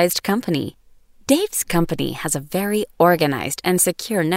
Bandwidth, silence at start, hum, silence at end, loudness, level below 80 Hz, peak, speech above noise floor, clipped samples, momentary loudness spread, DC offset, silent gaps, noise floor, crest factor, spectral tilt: 16.5 kHz; 0 s; none; 0 s; -20 LUFS; -46 dBFS; -2 dBFS; 30 dB; under 0.1%; 7 LU; under 0.1%; none; -49 dBFS; 18 dB; -4 dB/octave